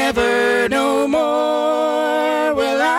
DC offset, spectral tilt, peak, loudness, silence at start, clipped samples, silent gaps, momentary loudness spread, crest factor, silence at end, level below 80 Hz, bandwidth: under 0.1%; -3.5 dB/octave; -8 dBFS; -17 LUFS; 0 s; under 0.1%; none; 2 LU; 8 dB; 0 s; -48 dBFS; 16.5 kHz